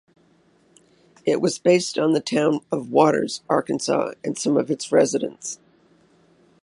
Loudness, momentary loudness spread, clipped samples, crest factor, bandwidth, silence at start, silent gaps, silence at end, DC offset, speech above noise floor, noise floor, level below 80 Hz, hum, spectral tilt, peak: -21 LUFS; 10 LU; under 0.1%; 20 dB; 11.5 kHz; 1.25 s; none; 1.05 s; under 0.1%; 38 dB; -59 dBFS; -72 dBFS; none; -4.5 dB/octave; -2 dBFS